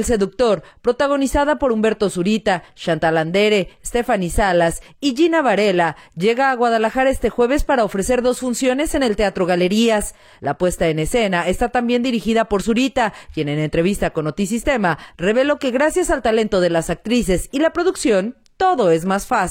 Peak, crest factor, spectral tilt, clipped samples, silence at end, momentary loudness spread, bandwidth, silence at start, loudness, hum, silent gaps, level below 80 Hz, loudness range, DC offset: -6 dBFS; 12 dB; -5 dB/octave; under 0.1%; 0 s; 5 LU; 17.5 kHz; 0 s; -18 LUFS; none; none; -36 dBFS; 2 LU; under 0.1%